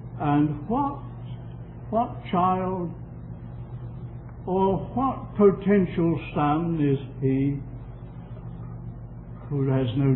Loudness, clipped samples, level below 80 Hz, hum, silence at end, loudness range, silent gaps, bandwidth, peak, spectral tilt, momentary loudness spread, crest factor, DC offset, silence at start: -25 LUFS; under 0.1%; -44 dBFS; none; 0 s; 6 LU; none; 4.1 kHz; -8 dBFS; -12.5 dB/octave; 17 LU; 18 dB; under 0.1%; 0 s